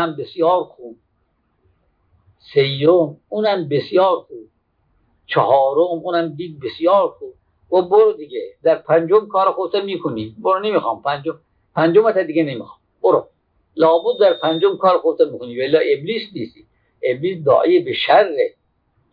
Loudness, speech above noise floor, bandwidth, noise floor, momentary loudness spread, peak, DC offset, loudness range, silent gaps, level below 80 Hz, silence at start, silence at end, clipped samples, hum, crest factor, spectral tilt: -17 LUFS; 49 dB; 5 kHz; -65 dBFS; 12 LU; -2 dBFS; under 0.1%; 2 LU; none; -66 dBFS; 0 s; 0.65 s; under 0.1%; none; 16 dB; -9 dB/octave